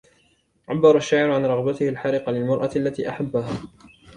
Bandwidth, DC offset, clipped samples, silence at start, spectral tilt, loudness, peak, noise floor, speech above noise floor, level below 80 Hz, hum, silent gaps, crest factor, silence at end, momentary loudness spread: 10 kHz; under 0.1%; under 0.1%; 0.7 s; -6.5 dB/octave; -21 LUFS; -2 dBFS; -63 dBFS; 42 dB; -56 dBFS; none; none; 20 dB; 0.3 s; 11 LU